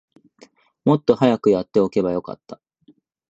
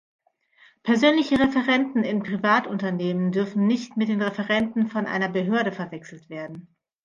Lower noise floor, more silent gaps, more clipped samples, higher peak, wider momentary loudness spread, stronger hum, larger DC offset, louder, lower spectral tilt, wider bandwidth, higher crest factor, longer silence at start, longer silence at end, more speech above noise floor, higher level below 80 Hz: about the same, -56 dBFS vs -58 dBFS; neither; neither; first, -2 dBFS vs -6 dBFS; second, 13 LU vs 16 LU; neither; neither; first, -19 LUFS vs -23 LUFS; first, -8 dB/octave vs -6.5 dB/octave; about the same, 8 kHz vs 7.4 kHz; about the same, 18 dB vs 18 dB; about the same, 0.85 s vs 0.85 s; first, 0.75 s vs 0.45 s; about the same, 38 dB vs 35 dB; about the same, -58 dBFS vs -60 dBFS